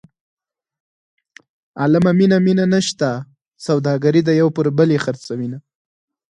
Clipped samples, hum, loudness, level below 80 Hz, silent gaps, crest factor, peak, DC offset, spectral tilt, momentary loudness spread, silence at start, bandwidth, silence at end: under 0.1%; none; -16 LUFS; -60 dBFS; 3.47-3.51 s; 16 dB; -2 dBFS; under 0.1%; -6.5 dB/octave; 15 LU; 1.75 s; 10.5 kHz; 0.8 s